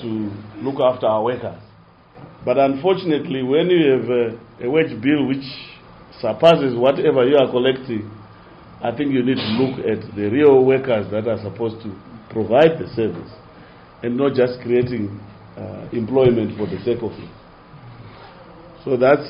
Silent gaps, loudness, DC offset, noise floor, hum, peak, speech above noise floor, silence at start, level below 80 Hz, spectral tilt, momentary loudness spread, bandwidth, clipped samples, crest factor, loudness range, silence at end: none; -19 LUFS; under 0.1%; -48 dBFS; none; 0 dBFS; 30 dB; 0 s; -52 dBFS; -5 dB/octave; 18 LU; 5.6 kHz; under 0.1%; 18 dB; 5 LU; 0 s